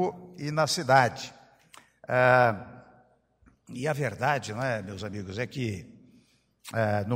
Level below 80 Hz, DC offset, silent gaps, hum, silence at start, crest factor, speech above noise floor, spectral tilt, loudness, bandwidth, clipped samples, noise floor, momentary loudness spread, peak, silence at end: -66 dBFS; under 0.1%; none; none; 0 s; 22 dB; 37 dB; -5 dB/octave; -27 LUFS; 16 kHz; under 0.1%; -63 dBFS; 19 LU; -6 dBFS; 0 s